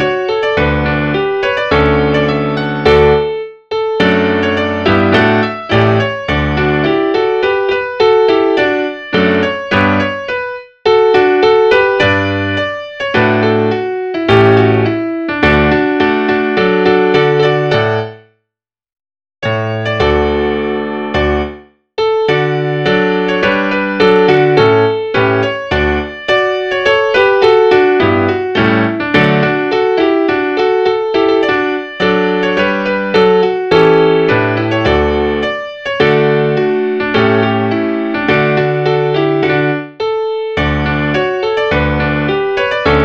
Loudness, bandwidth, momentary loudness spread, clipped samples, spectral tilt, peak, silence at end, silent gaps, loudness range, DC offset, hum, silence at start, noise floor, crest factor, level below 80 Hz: -12 LUFS; 7.2 kHz; 7 LU; under 0.1%; -7 dB/octave; 0 dBFS; 0 s; none; 3 LU; 0.2%; none; 0 s; -79 dBFS; 12 dB; -32 dBFS